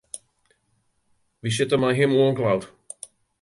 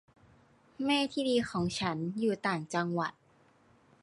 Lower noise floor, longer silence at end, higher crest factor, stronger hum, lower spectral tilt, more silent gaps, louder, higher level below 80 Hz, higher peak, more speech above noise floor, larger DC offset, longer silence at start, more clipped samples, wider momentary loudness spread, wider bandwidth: first, -69 dBFS vs -65 dBFS; second, 0.75 s vs 0.9 s; about the same, 16 dB vs 16 dB; neither; about the same, -5.5 dB/octave vs -5 dB/octave; neither; first, -22 LUFS vs -32 LUFS; first, -60 dBFS vs -66 dBFS; first, -8 dBFS vs -18 dBFS; first, 48 dB vs 33 dB; neither; second, 0.15 s vs 0.8 s; neither; first, 20 LU vs 5 LU; about the same, 11.5 kHz vs 11.5 kHz